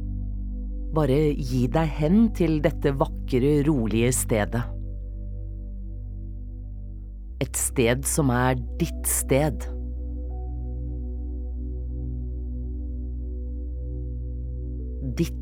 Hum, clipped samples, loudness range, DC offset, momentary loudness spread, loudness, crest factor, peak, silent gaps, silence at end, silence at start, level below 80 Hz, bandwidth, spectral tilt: none; under 0.1%; 11 LU; under 0.1%; 15 LU; -26 LUFS; 20 dB; -6 dBFS; none; 0 s; 0 s; -32 dBFS; 18 kHz; -5.5 dB/octave